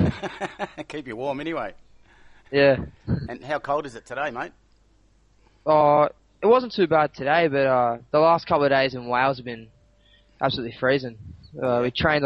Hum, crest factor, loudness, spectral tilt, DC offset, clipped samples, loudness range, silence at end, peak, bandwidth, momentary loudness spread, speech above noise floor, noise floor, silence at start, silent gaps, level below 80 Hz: none; 18 dB; -23 LUFS; -7 dB/octave; under 0.1%; under 0.1%; 6 LU; 0 s; -6 dBFS; 9.4 kHz; 15 LU; 37 dB; -59 dBFS; 0 s; none; -50 dBFS